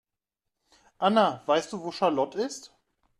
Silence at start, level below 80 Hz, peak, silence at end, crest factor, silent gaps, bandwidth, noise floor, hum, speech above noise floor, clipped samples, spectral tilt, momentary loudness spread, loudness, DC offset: 1 s; -72 dBFS; -8 dBFS; 0.55 s; 20 dB; none; 12.5 kHz; -86 dBFS; none; 60 dB; under 0.1%; -4.5 dB/octave; 12 LU; -27 LUFS; under 0.1%